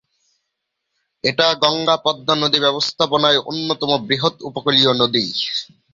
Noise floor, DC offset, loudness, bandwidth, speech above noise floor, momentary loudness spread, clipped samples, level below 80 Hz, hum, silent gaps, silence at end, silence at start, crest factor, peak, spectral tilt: -77 dBFS; under 0.1%; -17 LUFS; 7.8 kHz; 59 dB; 8 LU; under 0.1%; -60 dBFS; none; none; 0.3 s; 1.25 s; 18 dB; -2 dBFS; -4 dB/octave